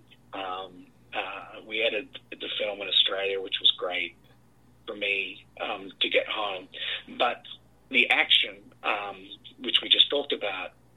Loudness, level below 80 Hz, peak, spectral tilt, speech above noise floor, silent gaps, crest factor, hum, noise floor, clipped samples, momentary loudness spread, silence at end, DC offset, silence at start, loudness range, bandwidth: -26 LUFS; -68 dBFS; -4 dBFS; -2.5 dB/octave; 32 dB; none; 26 dB; none; -60 dBFS; under 0.1%; 18 LU; 0.25 s; under 0.1%; 0.3 s; 6 LU; 13 kHz